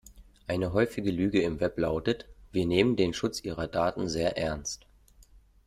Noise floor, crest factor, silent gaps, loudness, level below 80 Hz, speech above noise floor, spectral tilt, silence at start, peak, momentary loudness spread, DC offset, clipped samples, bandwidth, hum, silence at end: -57 dBFS; 20 dB; none; -29 LUFS; -50 dBFS; 29 dB; -5.5 dB/octave; 0.05 s; -10 dBFS; 10 LU; under 0.1%; under 0.1%; 14.5 kHz; none; 0.9 s